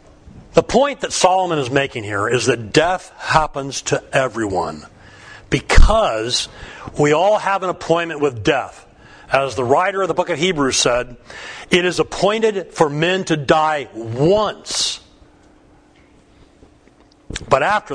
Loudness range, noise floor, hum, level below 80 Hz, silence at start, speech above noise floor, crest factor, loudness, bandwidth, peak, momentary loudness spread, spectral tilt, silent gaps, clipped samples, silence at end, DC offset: 3 LU; -50 dBFS; none; -26 dBFS; 0.25 s; 34 dB; 18 dB; -17 LUFS; 10.5 kHz; 0 dBFS; 9 LU; -4 dB/octave; none; under 0.1%; 0 s; under 0.1%